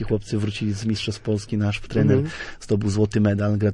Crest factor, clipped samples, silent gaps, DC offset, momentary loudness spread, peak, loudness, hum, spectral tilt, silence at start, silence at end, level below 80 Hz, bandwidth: 16 dB; under 0.1%; none; under 0.1%; 6 LU; -6 dBFS; -23 LUFS; none; -7 dB/octave; 0 s; 0 s; -44 dBFS; 10.5 kHz